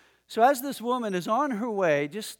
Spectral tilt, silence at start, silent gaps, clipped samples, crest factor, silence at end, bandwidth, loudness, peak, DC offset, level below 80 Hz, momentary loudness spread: -4.5 dB/octave; 0.3 s; none; under 0.1%; 18 dB; 0.05 s; 18.5 kHz; -26 LUFS; -8 dBFS; under 0.1%; -78 dBFS; 6 LU